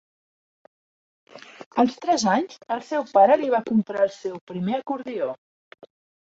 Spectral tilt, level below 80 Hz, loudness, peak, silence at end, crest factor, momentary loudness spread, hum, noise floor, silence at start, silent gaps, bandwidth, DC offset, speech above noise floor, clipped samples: -5 dB/octave; -68 dBFS; -23 LUFS; -6 dBFS; 0.95 s; 18 dB; 14 LU; none; under -90 dBFS; 1.35 s; 1.66-1.71 s, 4.41-4.47 s; 8 kHz; under 0.1%; over 68 dB; under 0.1%